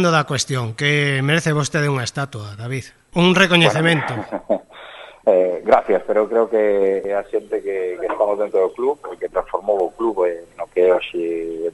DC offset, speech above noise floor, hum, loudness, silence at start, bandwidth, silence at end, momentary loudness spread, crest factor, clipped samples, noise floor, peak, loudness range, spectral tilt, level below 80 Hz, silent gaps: under 0.1%; 20 dB; none; -19 LUFS; 0 s; 11.5 kHz; 0.05 s; 12 LU; 18 dB; under 0.1%; -39 dBFS; -2 dBFS; 4 LU; -5 dB/octave; -52 dBFS; none